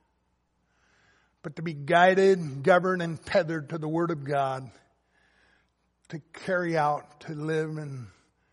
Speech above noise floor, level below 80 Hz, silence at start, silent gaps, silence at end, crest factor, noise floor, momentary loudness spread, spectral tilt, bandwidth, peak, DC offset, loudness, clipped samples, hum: 47 dB; -68 dBFS; 1.45 s; none; 0.45 s; 22 dB; -73 dBFS; 21 LU; -6.5 dB/octave; 11 kHz; -6 dBFS; under 0.1%; -26 LUFS; under 0.1%; none